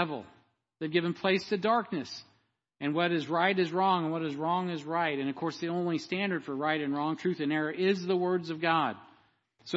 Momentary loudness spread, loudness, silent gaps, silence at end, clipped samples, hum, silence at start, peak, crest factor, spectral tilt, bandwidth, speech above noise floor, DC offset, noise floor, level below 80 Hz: 7 LU; -30 LUFS; none; 0 s; under 0.1%; none; 0 s; -12 dBFS; 18 dB; -6 dB/octave; 8 kHz; 42 dB; under 0.1%; -72 dBFS; -78 dBFS